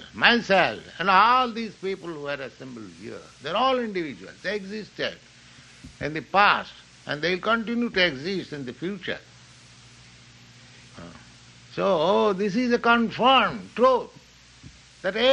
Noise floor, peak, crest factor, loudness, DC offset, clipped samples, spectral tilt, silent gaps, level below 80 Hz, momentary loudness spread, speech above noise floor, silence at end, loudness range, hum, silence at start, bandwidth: -50 dBFS; -2 dBFS; 22 dB; -23 LUFS; under 0.1%; under 0.1%; -4.5 dB/octave; none; -58 dBFS; 21 LU; 26 dB; 0 s; 8 LU; none; 0 s; 9.8 kHz